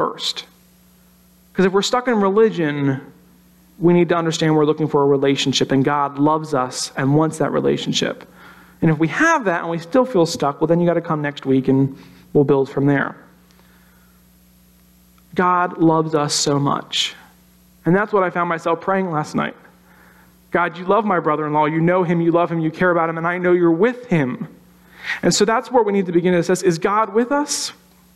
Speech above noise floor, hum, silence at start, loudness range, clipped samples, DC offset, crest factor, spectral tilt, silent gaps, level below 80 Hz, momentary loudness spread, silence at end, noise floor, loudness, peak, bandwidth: 34 dB; none; 0 s; 4 LU; under 0.1%; under 0.1%; 14 dB; -5 dB/octave; none; -56 dBFS; 7 LU; 0.45 s; -52 dBFS; -18 LUFS; -4 dBFS; 13.5 kHz